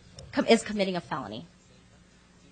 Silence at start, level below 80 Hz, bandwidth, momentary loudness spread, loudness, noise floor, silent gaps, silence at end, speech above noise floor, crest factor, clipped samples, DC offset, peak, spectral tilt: 0.15 s; -60 dBFS; 9.4 kHz; 15 LU; -28 LUFS; -57 dBFS; none; 1.05 s; 30 dB; 24 dB; under 0.1%; under 0.1%; -8 dBFS; -4.5 dB/octave